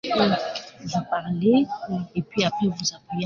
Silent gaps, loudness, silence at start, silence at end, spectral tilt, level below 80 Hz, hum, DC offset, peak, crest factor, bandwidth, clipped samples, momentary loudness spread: none; -24 LUFS; 0.05 s; 0 s; -5 dB/octave; -60 dBFS; none; under 0.1%; -6 dBFS; 18 dB; 7.4 kHz; under 0.1%; 9 LU